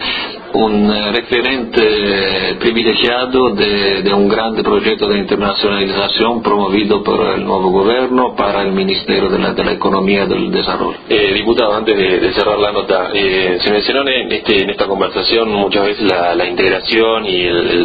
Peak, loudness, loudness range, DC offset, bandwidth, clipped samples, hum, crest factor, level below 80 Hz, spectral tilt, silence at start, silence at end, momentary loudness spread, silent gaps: 0 dBFS; -13 LUFS; 1 LU; under 0.1%; 5 kHz; under 0.1%; none; 14 dB; -40 dBFS; -7.5 dB/octave; 0 s; 0 s; 3 LU; none